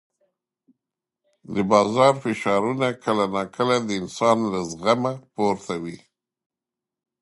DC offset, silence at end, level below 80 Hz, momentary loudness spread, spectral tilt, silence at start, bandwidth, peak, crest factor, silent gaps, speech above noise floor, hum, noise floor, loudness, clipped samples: under 0.1%; 1.25 s; -62 dBFS; 10 LU; -5.5 dB/octave; 1.5 s; 11.5 kHz; -2 dBFS; 22 dB; none; 66 dB; none; -88 dBFS; -22 LUFS; under 0.1%